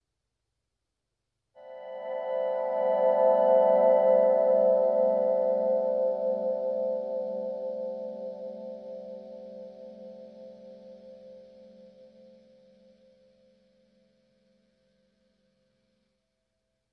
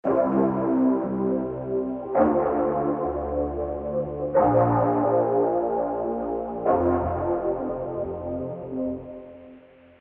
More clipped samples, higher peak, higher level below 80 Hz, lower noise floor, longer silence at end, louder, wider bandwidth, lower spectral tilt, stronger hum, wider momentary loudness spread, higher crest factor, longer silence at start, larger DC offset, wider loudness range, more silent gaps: neither; second, -12 dBFS vs -8 dBFS; second, -82 dBFS vs -46 dBFS; first, -84 dBFS vs -50 dBFS; first, 5.5 s vs 0.4 s; about the same, -26 LUFS vs -25 LUFS; first, 4.5 kHz vs 3.3 kHz; second, -8.5 dB/octave vs -12.5 dB/octave; first, 50 Hz at -80 dBFS vs none; first, 24 LU vs 9 LU; about the same, 18 dB vs 16 dB; first, 1.6 s vs 0.05 s; neither; first, 22 LU vs 4 LU; neither